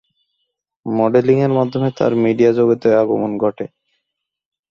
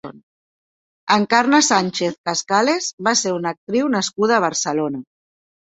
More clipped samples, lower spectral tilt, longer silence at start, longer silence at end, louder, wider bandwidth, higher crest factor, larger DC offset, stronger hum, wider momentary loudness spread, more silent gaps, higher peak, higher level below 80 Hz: neither; first, -8.5 dB/octave vs -3 dB/octave; first, 0.85 s vs 0.05 s; first, 1.05 s vs 0.75 s; about the same, -16 LUFS vs -18 LUFS; second, 7 kHz vs 8.4 kHz; about the same, 16 dB vs 18 dB; neither; neither; about the same, 10 LU vs 10 LU; second, none vs 0.23-1.07 s, 2.18-2.24 s, 2.93-2.98 s, 3.57-3.67 s; about the same, -2 dBFS vs -2 dBFS; first, -58 dBFS vs -64 dBFS